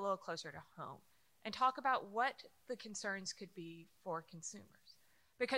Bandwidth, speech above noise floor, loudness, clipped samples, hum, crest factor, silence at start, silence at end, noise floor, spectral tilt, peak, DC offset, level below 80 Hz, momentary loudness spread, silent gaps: 16 kHz; 27 dB; -42 LUFS; under 0.1%; none; 20 dB; 0 s; 0 s; -70 dBFS; -3 dB/octave; -22 dBFS; under 0.1%; -84 dBFS; 16 LU; none